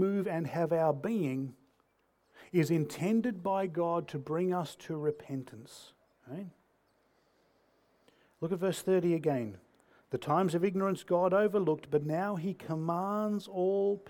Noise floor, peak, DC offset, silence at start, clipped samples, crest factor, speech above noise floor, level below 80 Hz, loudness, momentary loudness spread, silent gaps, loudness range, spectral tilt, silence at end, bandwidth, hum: -73 dBFS; -16 dBFS; under 0.1%; 0 s; under 0.1%; 18 dB; 42 dB; -76 dBFS; -32 LUFS; 13 LU; none; 11 LU; -7 dB/octave; 0 s; 18 kHz; none